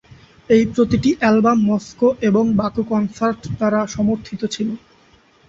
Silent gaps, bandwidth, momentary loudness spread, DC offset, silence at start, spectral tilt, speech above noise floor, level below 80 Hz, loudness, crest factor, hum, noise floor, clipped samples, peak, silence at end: none; 7.8 kHz; 9 LU; under 0.1%; 0.5 s; -6.5 dB/octave; 36 dB; -46 dBFS; -18 LUFS; 16 dB; none; -53 dBFS; under 0.1%; -2 dBFS; 0.7 s